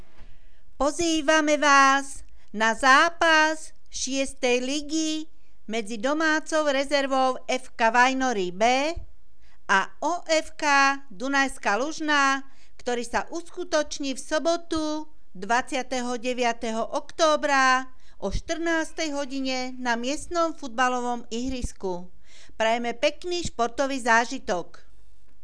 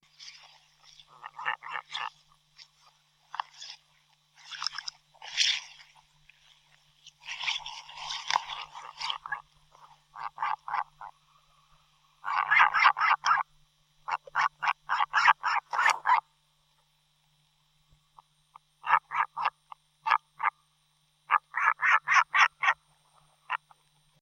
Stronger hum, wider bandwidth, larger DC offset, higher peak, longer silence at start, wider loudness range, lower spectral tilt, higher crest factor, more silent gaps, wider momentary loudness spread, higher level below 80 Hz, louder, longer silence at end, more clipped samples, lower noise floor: neither; second, 11 kHz vs 15.5 kHz; first, 2% vs under 0.1%; about the same, -6 dBFS vs -6 dBFS; about the same, 0.2 s vs 0.2 s; second, 7 LU vs 13 LU; first, -2.5 dB/octave vs 2 dB/octave; second, 20 dB vs 26 dB; neither; second, 12 LU vs 21 LU; first, -46 dBFS vs -74 dBFS; first, -24 LUFS vs -28 LUFS; first, 0.8 s vs 0.65 s; neither; second, -58 dBFS vs -70 dBFS